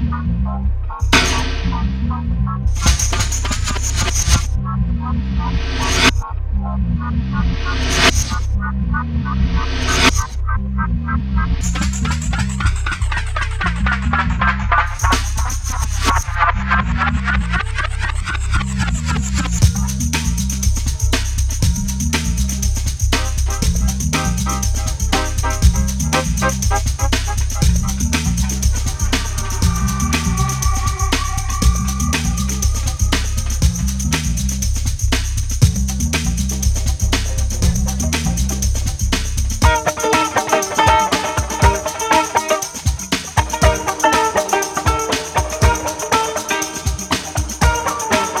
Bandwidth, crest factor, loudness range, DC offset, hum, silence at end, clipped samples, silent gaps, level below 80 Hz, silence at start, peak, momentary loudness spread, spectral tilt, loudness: 16 kHz; 16 dB; 2 LU; under 0.1%; none; 0 s; under 0.1%; none; -20 dBFS; 0 s; 0 dBFS; 6 LU; -4 dB/octave; -18 LUFS